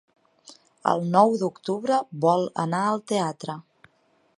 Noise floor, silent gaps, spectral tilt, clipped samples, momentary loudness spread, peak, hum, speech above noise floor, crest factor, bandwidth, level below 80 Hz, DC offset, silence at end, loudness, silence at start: -65 dBFS; none; -6 dB/octave; under 0.1%; 10 LU; -4 dBFS; none; 42 dB; 22 dB; 11.5 kHz; -74 dBFS; under 0.1%; 0.75 s; -24 LUFS; 0.5 s